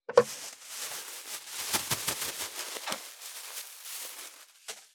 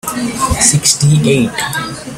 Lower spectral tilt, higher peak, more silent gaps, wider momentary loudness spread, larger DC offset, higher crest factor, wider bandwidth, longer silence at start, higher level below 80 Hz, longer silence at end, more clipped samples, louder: second, -1 dB/octave vs -3.5 dB/octave; second, -6 dBFS vs 0 dBFS; neither; first, 14 LU vs 10 LU; neither; first, 30 dB vs 14 dB; first, over 20 kHz vs 16.5 kHz; about the same, 0.1 s vs 0.05 s; second, -72 dBFS vs -32 dBFS; about the same, 0.1 s vs 0 s; neither; second, -34 LUFS vs -12 LUFS